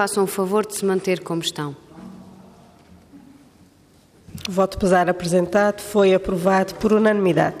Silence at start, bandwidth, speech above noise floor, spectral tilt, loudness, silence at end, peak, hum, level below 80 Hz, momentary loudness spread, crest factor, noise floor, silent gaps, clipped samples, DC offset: 0 s; 15.5 kHz; 34 dB; -5.5 dB/octave; -20 LUFS; 0 s; -6 dBFS; none; -48 dBFS; 15 LU; 16 dB; -53 dBFS; none; under 0.1%; under 0.1%